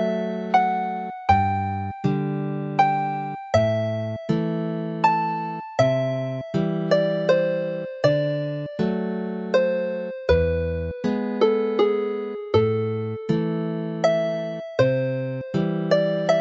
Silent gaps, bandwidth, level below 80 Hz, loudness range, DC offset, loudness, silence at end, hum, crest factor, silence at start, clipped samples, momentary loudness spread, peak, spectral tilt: none; 7.8 kHz; -44 dBFS; 1 LU; under 0.1%; -23 LUFS; 0 s; none; 18 dB; 0 s; under 0.1%; 7 LU; -6 dBFS; -7.5 dB/octave